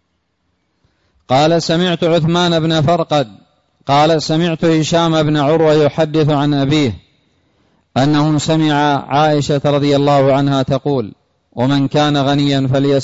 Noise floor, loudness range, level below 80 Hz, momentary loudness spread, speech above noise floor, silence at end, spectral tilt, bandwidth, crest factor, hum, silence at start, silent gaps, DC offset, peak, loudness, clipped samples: -66 dBFS; 2 LU; -46 dBFS; 5 LU; 53 dB; 0 s; -6 dB/octave; 8 kHz; 10 dB; none; 1.3 s; none; under 0.1%; -4 dBFS; -14 LUFS; under 0.1%